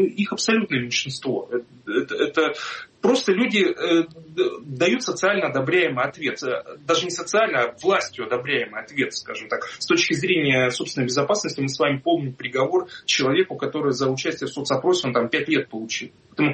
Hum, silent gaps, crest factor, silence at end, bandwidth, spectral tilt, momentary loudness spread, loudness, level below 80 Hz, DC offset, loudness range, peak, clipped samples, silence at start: none; none; 16 dB; 0 s; 8.8 kHz; -4 dB/octave; 9 LU; -22 LUFS; -66 dBFS; under 0.1%; 2 LU; -6 dBFS; under 0.1%; 0 s